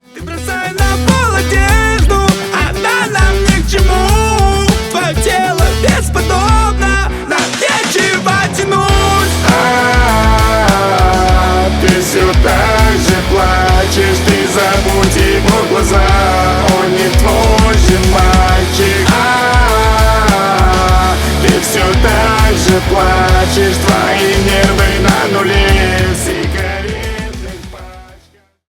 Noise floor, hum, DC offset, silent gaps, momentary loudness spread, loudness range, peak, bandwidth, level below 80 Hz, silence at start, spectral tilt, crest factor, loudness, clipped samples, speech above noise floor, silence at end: -48 dBFS; none; under 0.1%; none; 4 LU; 2 LU; 0 dBFS; 18 kHz; -16 dBFS; 0.15 s; -4.5 dB/octave; 10 dB; -10 LUFS; under 0.1%; 38 dB; 0.65 s